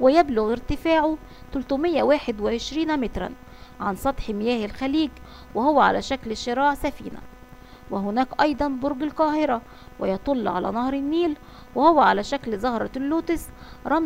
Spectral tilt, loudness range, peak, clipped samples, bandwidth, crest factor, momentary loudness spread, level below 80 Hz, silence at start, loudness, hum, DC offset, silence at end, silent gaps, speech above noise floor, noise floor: -5.5 dB/octave; 3 LU; -4 dBFS; under 0.1%; 16 kHz; 20 dB; 13 LU; -42 dBFS; 0 s; -24 LUFS; none; under 0.1%; 0 s; none; 22 dB; -45 dBFS